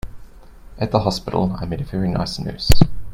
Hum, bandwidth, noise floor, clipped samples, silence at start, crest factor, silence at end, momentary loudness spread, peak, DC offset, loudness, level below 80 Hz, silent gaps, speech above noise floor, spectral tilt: none; 16.5 kHz; -40 dBFS; under 0.1%; 0.05 s; 18 dB; 0 s; 9 LU; 0 dBFS; under 0.1%; -21 LUFS; -28 dBFS; none; 24 dB; -6 dB/octave